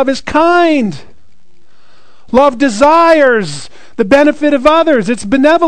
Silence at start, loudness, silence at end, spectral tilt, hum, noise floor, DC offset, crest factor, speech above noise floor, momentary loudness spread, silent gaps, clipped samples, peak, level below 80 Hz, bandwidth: 0 s; -10 LUFS; 0 s; -5 dB/octave; none; -53 dBFS; 4%; 10 dB; 44 dB; 11 LU; none; 1%; 0 dBFS; -40 dBFS; 12 kHz